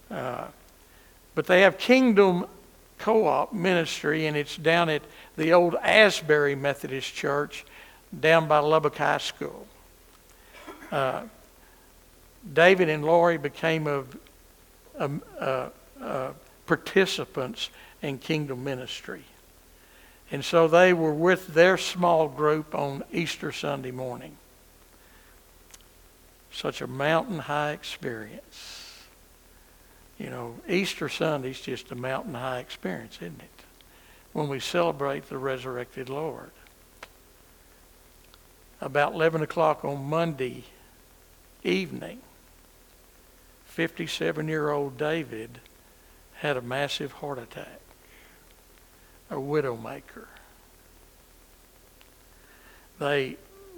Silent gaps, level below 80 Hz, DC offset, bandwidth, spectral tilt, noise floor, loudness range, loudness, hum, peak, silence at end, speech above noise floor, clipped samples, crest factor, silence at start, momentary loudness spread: none; -60 dBFS; under 0.1%; 20 kHz; -5 dB/octave; -55 dBFS; 13 LU; -26 LUFS; none; -2 dBFS; 0 s; 30 dB; under 0.1%; 26 dB; 0.1 s; 21 LU